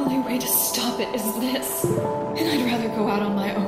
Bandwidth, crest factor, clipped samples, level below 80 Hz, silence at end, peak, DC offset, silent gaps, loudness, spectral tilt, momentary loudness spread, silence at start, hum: 16 kHz; 16 dB; under 0.1%; -56 dBFS; 0 s; -8 dBFS; under 0.1%; none; -23 LUFS; -4 dB/octave; 5 LU; 0 s; none